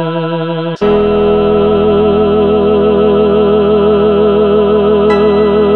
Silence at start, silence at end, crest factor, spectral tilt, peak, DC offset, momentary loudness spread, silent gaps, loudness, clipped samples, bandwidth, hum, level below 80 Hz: 0 s; 0 s; 8 dB; -9 dB/octave; 0 dBFS; 1%; 4 LU; none; -10 LUFS; under 0.1%; 4.4 kHz; none; -32 dBFS